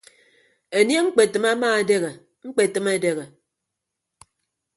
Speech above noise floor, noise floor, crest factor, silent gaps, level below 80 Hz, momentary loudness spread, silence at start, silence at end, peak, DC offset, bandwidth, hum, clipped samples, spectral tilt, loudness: 62 dB; -82 dBFS; 20 dB; none; -70 dBFS; 10 LU; 0.7 s; 1.5 s; -2 dBFS; under 0.1%; 11.5 kHz; none; under 0.1%; -3.5 dB/octave; -21 LUFS